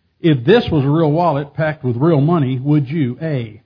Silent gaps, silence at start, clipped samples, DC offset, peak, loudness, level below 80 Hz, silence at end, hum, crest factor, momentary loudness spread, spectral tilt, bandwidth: none; 0.25 s; under 0.1%; under 0.1%; 0 dBFS; -16 LUFS; -46 dBFS; 0.1 s; none; 16 dB; 7 LU; -10 dB/octave; 5.2 kHz